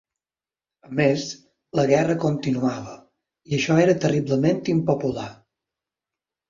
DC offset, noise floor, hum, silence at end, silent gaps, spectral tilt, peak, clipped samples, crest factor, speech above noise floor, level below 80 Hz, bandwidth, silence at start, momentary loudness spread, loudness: under 0.1%; under -90 dBFS; none; 1.15 s; none; -6.5 dB/octave; -4 dBFS; under 0.1%; 18 dB; over 69 dB; -58 dBFS; 7.6 kHz; 0.9 s; 15 LU; -22 LUFS